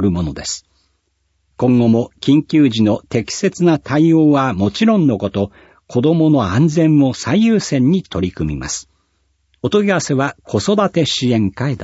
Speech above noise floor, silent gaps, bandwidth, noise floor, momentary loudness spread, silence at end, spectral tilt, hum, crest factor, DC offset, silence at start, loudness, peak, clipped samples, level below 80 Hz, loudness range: 51 dB; none; 8 kHz; -65 dBFS; 10 LU; 0 s; -6 dB/octave; none; 14 dB; under 0.1%; 0 s; -15 LUFS; -2 dBFS; under 0.1%; -42 dBFS; 4 LU